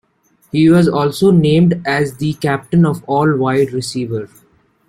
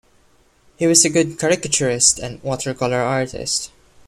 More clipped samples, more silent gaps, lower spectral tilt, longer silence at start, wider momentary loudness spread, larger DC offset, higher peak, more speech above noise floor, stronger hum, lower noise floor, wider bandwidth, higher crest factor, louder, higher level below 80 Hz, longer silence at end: neither; neither; first, -7 dB/octave vs -3 dB/octave; second, 0.55 s vs 0.8 s; about the same, 11 LU vs 11 LU; neither; about the same, -2 dBFS vs 0 dBFS; first, 43 dB vs 37 dB; neither; about the same, -57 dBFS vs -56 dBFS; about the same, 14.5 kHz vs 15.5 kHz; second, 12 dB vs 20 dB; first, -14 LUFS vs -17 LUFS; about the same, -48 dBFS vs -50 dBFS; first, 0.65 s vs 0.4 s